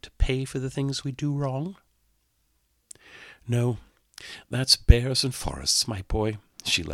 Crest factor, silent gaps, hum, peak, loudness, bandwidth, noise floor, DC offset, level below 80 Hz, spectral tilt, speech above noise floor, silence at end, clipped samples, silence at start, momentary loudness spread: 26 dB; none; none; 0 dBFS; -25 LUFS; 16 kHz; -70 dBFS; under 0.1%; -32 dBFS; -4 dB/octave; 45 dB; 0 s; under 0.1%; 0.05 s; 21 LU